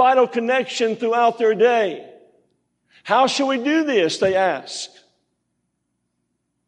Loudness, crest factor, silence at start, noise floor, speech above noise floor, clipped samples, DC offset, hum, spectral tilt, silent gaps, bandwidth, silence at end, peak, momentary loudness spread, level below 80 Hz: -19 LUFS; 16 dB; 0 s; -74 dBFS; 55 dB; under 0.1%; under 0.1%; 60 Hz at -55 dBFS; -3.5 dB/octave; none; 10.5 kHz; 1.8 s; -4 dBFS; 13 LU; -70 dBFS